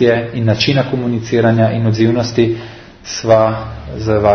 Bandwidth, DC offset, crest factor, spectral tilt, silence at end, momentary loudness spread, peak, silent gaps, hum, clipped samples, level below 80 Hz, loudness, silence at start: 6.6 kHz; under 0.1%; 14 dB; -6.5 dB/octave; 0 s; 13 LU; 0 dBFS; none; none; under 0.1%; -40 dBFS; -14 LUFS; 0 s